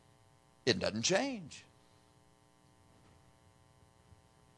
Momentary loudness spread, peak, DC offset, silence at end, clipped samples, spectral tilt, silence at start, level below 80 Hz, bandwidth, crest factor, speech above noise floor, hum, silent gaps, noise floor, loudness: 19 LU; -14 dBFS; under 0.1%; 2.95 s; under 0.1%; -3 dB/octave; 0.65 s; -72 dBFS; 11 kHz; 28 dB; 32 dB; none; none; -66 dBFS; -34 LUFS